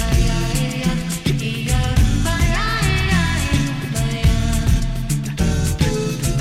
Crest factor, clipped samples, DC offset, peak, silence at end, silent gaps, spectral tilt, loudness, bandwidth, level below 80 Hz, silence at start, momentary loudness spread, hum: 14 dB; under 0.1%; under 0.1%; -4 dBFS; 0 s; none; -5 dB/octave; -19 LUFS; 16 kHz; -22 dBFS; 0 s; 4 LU; none